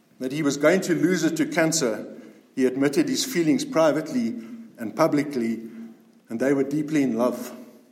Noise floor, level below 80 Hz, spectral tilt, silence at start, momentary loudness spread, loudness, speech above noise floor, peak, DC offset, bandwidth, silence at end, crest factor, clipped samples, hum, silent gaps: -44 dBFS; -76 dBFS; -4.5 dB/octave; 0.2 s; 15 LU; -23 LUFS; 22 dB; -6 dBFS; under 0.1%; 16.5 kHz; 0.2 s; 18 dB; under 0.1%; none; none